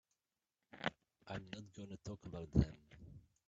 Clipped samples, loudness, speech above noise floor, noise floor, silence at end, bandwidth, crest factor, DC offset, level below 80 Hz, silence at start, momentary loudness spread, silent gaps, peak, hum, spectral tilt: under 0.1%; -44 LUFS; over 48 dB; under -90 dBFS; 0.3 s; 7.8 kHz; 28 dB; under 0.1%; -54 dBFS; 0.75 s; 22 LU; none; -18 dBFS; none; -7 dB/octave